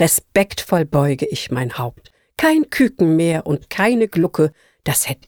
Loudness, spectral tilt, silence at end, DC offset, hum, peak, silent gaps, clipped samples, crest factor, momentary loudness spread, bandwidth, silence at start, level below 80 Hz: -18 LUFS; -5 dB/octave; 0.15 s; under 0.1%; none; -4 dBFS; none; under 0.1%; 14 dB; 8 LU; over 20 kHz; 0 s; -48 dBFS